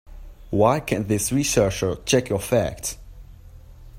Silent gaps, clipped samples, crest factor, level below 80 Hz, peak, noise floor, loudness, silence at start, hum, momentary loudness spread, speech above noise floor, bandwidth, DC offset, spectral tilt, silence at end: none; under 0.1%; 20 dB; -42 dBFS; -2 dBFS; -44 dBFS; -22 LUFS; 0.05 s; none; 9 LU; 22 dB; 16 kHz; under 0.1%; -4.5 dB/octave; 0 s